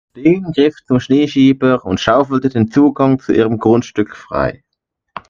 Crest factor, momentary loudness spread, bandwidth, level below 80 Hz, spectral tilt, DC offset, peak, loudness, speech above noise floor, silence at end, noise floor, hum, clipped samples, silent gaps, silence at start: 14 dB; 8 LU; 7.2 kHz; -44 dBFS; -7 dB/octave; under 0.1%; 0 dBFS; -14 LUFS; 61 dB; 0.1 s; -74 dBFS; none; under 0.1%; none; 0.15 s